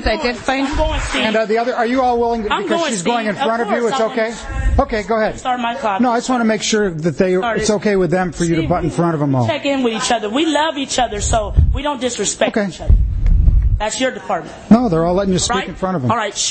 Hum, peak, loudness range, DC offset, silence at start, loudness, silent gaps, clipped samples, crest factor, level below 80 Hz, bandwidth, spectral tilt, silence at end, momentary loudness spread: none; 0 dBFS; 1 LU; under 0.1%; 0 s; -17 LUFS; none; under 0.1%; 16 dB; -22 dBFS; 8.8 kHz; -5 dB/octave; 0 s; 4 LU